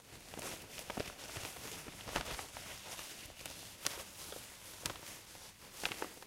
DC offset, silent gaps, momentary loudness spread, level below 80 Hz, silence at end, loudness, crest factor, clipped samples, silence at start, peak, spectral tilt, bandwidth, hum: under 0.1%; none; 9 LU; -62 dBFS; 0 s; -45 LUFS; 34 dB; under 0.1%; 0 s; -14 dBFS; -2 dB/octave; 16.5 kHz; none